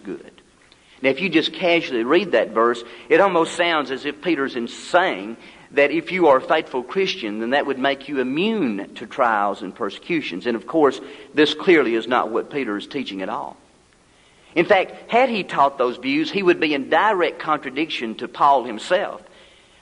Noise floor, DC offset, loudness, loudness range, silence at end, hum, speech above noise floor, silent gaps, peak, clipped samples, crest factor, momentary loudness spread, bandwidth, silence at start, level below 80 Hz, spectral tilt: -55 dBFS; under 0.1%; -20 LUFS; 3 LU; 0.6 s; none; 35 dB; none; -2 dBFS; under 0.1%; 18 dB; 11 LU; 10.5 kHz; 0.05 s; -64 dBFS; -5 dB/octave